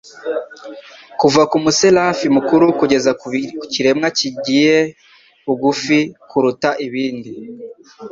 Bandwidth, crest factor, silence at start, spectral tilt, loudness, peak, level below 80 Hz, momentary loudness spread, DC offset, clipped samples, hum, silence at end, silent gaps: 7.8 kHz; 16 dB; 0.05 s; -4 dB/octave; -15 LUFS; 0 dBFS; -58 dBFS; 20 LU; under 0.1%; under 0.1%; none; 0 s; none